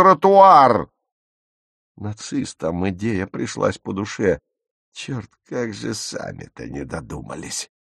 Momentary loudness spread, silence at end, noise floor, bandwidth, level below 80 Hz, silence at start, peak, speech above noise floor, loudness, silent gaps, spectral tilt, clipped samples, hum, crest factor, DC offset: 21 LU; 0.3 s; under -90 dBFS; 12.5 kHz; -50 dBFS; 0 s; 0 dBFS; over 71 dB; -18 LUFS; 1.12-1.95 s, 4.71-4.92 s; -5 dB/octave; under 0.1%; none; 20 dB; under 0.1%